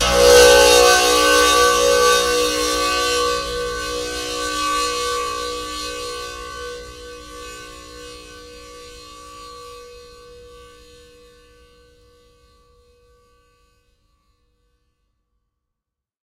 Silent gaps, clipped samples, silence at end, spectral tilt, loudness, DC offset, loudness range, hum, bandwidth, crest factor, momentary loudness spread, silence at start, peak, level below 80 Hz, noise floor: none; under 0.1%; 6.3 s; -1 dB/octave; -15 LUFS; under 0.1%; 26 LU; none; 16 kHz; 20 dB; 28 LU; 0 s; 0 dBFS; -40 dBFS; -84 dBFS